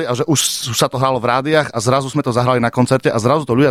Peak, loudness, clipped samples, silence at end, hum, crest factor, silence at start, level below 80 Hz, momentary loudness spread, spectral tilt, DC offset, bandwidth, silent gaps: -2 dBFS; -16 LUFS; under 0.1%; 0 s; none; 14 dB; 0 s; -50 dBFS; 2 LU; -4.5 dB/octave; under 0.1%; 15.5 kHz; none